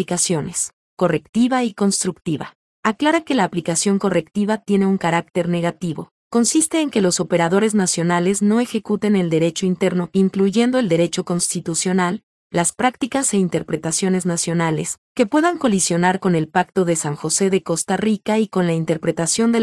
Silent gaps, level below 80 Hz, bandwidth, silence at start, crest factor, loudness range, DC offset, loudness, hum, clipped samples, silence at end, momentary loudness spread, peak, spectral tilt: 0.73-0.97 s, 1.29-1.33 s, 2.55-2.83 s, 6.11-6.31 s, 12.23-12.50 s, 14.98-15.15 s; -58 dBFS; 12 kHz; 0 s; 16 dB; 2 LU; under 0.1%; -19 LUFS; none; under 0.1%; 0 s; 6 LU; -2 dBFS; -4.5 dB/octave